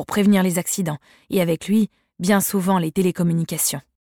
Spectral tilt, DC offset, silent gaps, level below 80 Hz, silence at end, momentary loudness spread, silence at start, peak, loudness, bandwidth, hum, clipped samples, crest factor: -5 dB/octave; under 0.1%; none; -56 dBFS; 0.25 s; 8 LU; 0 s; -6 dBFS; -20 LUFS; 18 kHz; none; under 0.1%; 14 dB